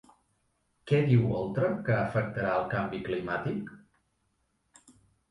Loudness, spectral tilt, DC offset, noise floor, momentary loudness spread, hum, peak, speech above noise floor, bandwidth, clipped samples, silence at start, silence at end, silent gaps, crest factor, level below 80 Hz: -29 LUFS; -8.5 dB/octave; under 0.1%; -75 dBFS; 9 LU; none; -12 dBFS; 47 dB; 10.5 kHz; under 0.1%; 0.85 s; 1.55 s; none; 18 dB; -58 dBFS